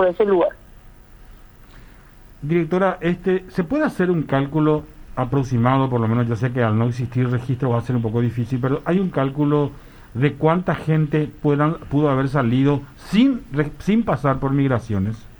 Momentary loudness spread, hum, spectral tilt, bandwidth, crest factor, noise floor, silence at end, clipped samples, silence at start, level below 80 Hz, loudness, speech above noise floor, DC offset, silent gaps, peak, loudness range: 5 LU; none; -8.5 dB/octave; over 20 kHz; 18 dB; -45 dBFS; 0.05 s; under 0.1%; 0 s; -44 dBFS; -20 LUFS; 25 dB; under 0.1%; none; -2 dBFS; 3 LU